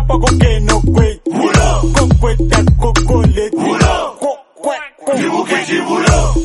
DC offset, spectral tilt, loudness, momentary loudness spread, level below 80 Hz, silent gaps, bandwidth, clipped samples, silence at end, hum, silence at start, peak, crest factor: under 0.1%; -5.5 dB/octave; -13 LUFS; 9 LU; -16 dBFS; none; 11.5 kHz; under 0.1%; 0 s; none; 0 s; 0 dBFS; 12 dB